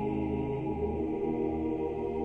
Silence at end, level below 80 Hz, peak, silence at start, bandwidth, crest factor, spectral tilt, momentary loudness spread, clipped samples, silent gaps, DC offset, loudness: 0 s; -46 dBFS; -20 dBFS; 0 s; 3.9 kHz; 12 dB; -10 dB/octave; 2 LU; under 0.1%; none; under 0.1%; -33 LUFS